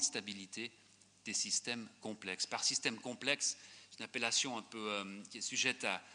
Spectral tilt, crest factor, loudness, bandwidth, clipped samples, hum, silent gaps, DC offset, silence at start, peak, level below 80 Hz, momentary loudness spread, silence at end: -0.5 dB/octave; 24 dB; -38 LUFS; 10 kHz; under 0.1%; none; none; under 0.1%; 0 s; -18 dBFS; -90 dBFS; 13 LU; 0 s